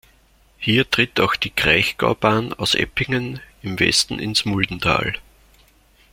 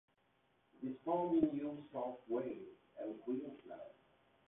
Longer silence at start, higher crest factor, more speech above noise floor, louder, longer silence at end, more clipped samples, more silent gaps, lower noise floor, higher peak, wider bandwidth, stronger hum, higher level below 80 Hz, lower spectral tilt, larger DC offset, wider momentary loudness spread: second, 0.6 s vs 0.8 s; about the same, 20 dB vs 22 dB; about the same, 35 dB vs 36 dB; first, -19 LUFS vs -41 LUFS; first, 0.9 s vs 0.6 s; neither; neither; second, -55 dBFS vs -77 dBFS; first, -2 dBFS vs -22 dBFS; first, 16.5 kHz vs 3.8 kHz; neither; first, -44 dBFS vs -78 dBFS; second, -3.5 dB/octave vs -5.5 dB/octave; neither; second, 10 LU vs 18 LU